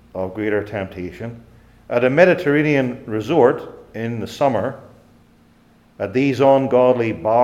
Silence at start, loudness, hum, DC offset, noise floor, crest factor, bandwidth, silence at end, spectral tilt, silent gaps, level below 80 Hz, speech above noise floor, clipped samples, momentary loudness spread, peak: 0.15 s; -18 LUFS; none; under 0.1%; -53 dBFS; 18 dB; 13 kHz; 0 s; -7.5 dB/octave; none; -54 dBFS; 35 dB; under 0.1%; 16 LU; 0 dBFS